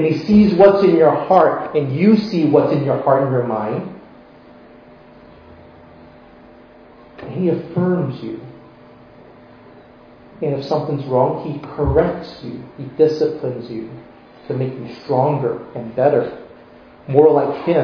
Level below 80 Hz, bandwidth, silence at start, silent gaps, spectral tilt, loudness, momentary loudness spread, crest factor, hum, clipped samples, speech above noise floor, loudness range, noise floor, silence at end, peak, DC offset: -42 dBFS; 5.4 kHz; 0 s; none; -9.5 dB/octave; -17 LUFS; 18 LU; 18 dB; none; under 0.1%; 28 dB; 11 LU; -44 dBFS; 0 s; 0 dBFS; under 0.1%